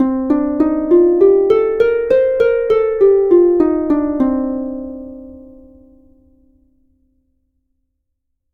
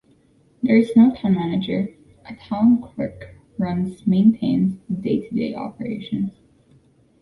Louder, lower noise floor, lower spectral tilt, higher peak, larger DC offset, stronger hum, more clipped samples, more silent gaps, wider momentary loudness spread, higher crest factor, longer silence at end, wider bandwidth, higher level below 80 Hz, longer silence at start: first, -14 LUFS vs -21 LUFS; first, -71 dBFS vs -57 dBFS; about the same, -8.5 dB/octave vs -9 dB/octave; first, 0 dBFS vs -4 dBFS; neither; neither; neither; neither; about the same, 14 LU vs 14 LU; about the same, 14 dB vs 16 dB; first, 3.15 s vs 0.9 s; about the same, 4.5 kHz vs 4.6 kHz; first, -44 dBFS vs -54 dBFS; second, 0 s vs 0.65 s